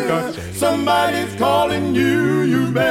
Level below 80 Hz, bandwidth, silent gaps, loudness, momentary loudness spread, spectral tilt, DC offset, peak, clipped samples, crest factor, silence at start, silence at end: -48 dBFS; 17.5 kHz; none; -18 LUFS; 4 LU; -5.5 dB/octave; under 0.1%; -2 dBFS; under 0.1%; 14 dB; 0 s; 0 s